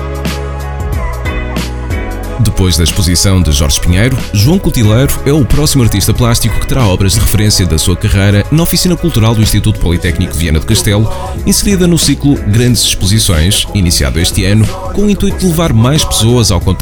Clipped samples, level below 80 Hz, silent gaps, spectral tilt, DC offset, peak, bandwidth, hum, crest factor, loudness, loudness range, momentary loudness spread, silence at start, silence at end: 0.1%; -18 dBFS; none; -4.5 dB/octave; under 0.1%; 0 dBFS; over 20 kHz; none; 10 dB; -10 LUFS; 2 LU; 9 LU; 0 s; 0 s